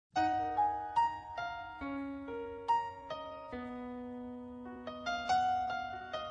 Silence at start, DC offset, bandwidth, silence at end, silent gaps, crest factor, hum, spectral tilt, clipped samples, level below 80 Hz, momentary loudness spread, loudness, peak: 0.15 s; under 0.1%; 9.6 kHz; 0 s; none; 16 dB; none; -4.5 dB/octave; under 0.1%; -64 dBFS; 12 LU; -37 LUFS; -22 dBFS